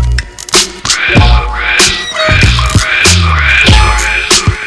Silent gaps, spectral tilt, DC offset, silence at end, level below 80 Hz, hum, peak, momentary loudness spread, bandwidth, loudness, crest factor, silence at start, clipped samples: none; -3 dB/octave; under 0.1%; 0 s; -14 dBFS; none; 0 dBFS; 5 LU; 11 kHz; -7 LUFS; 8 dB; 0 s; 2%